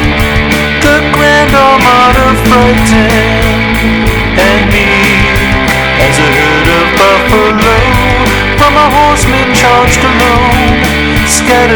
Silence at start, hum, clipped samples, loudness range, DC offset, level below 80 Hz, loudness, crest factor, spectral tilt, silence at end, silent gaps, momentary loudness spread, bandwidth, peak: 0 s; none; 2%; 1 LU; under 0.1%; -16 dBFS; -6 LUFS; 6 dB; -4.5 dB/octave; 0 s; none; 4 LU; over 20 kHz; 0 dBFS